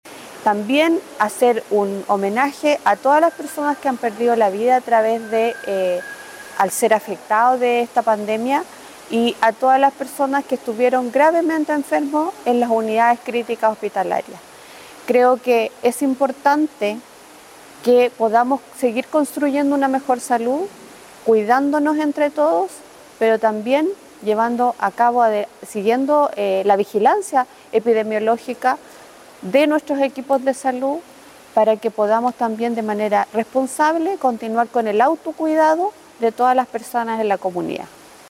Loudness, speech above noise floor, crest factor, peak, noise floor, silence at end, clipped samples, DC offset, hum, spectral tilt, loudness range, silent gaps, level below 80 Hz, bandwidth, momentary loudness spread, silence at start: -18 LUFS; 25 dB; 16 dB; -2 dBFS; -43 dBFS; 0.4 s; under 0.1%; under 0.1%; none; -4.5 dB/octave; 2 LU; none; -68 dBFS; 16.5 kHz; 8 LU; 0.05 s